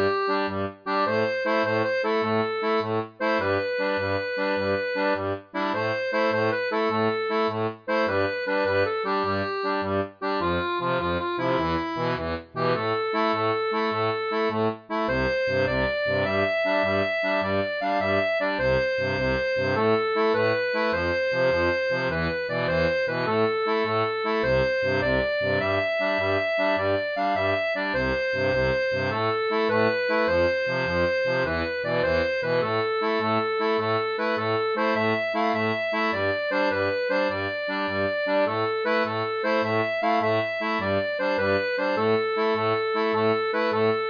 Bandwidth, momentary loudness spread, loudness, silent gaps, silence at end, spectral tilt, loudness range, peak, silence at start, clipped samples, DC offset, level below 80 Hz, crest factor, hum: 5.2 kHz; 3 LU; -24 LUFS; none; 0 s; -6.5 dB/octave; 2 LU; -10 dBFS; 0 s; under 0.1%; under 0.1%; -50 dBFS; 14 dB; none